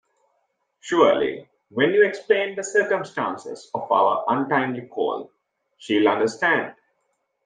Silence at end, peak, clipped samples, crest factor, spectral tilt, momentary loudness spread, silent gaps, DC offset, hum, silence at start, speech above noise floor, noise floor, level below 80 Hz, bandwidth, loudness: 0.75 s; -4 dBFS; under 0.1%; 20 dB; -4.5 dB/octave; 15 LU; none; under 0.1%; none; 0.85 s; 51 dB; -73 dBFS; -72 dBFS; 9.8 kHz; -22 LUFS